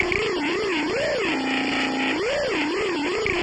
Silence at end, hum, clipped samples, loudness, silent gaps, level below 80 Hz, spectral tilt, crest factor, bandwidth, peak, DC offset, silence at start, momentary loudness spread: 0 s; none; under 0.1%; -23 LUFS; none; -48 dBFS; -4 dB/octave; 16 dB; 11 kHz; -8 dBFS; under 0.1%; 0 s; 1 LU